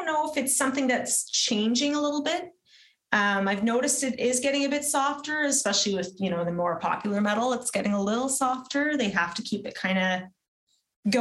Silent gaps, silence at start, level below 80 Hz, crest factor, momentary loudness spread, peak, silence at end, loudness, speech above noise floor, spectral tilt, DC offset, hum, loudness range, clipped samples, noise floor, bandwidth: 10.48-10.67 s, 10.96-11.03 s; 0 s; -68 dBFS; 22 dB; 5 LU; -6 dBFS; 0 s; -26 LUFS; 33 dB; -3 dB/octave; under 0.1%; none; 2 LU; under 0.1%; -59 dBFS; over 20 kHz